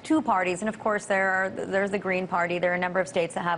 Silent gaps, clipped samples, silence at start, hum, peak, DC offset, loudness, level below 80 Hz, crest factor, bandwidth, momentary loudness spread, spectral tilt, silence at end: none; under 0.1%; 0 s; none; -12 dBFS; under 0.1%; -26 LUFS; -62 dBFS; 14 dB; 11 kHz; 4 LU; -5 dB/octave; 0 s